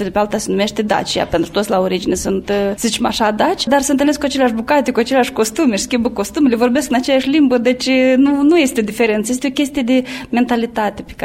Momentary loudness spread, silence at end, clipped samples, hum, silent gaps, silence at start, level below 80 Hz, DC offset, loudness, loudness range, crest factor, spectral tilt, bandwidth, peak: 5 LU; 0 s; under 0.1%; none; none; 0 s; -42 dBFS; under 0.1%; -15 LUFS; 2 LU; 14 dB; -4 dB/octave; 16.5 kHz; -2 dBFS